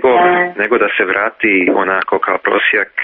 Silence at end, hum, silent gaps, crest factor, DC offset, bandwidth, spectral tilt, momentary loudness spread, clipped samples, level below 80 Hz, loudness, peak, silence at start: 0 s; none; none; 12 dB; under 0.1%; 4.7 kHz; -1.5 dB/octave; 4 LU; under 0.1%; -54 dBFS; -13 LUFS; 0 dBFS; 0 s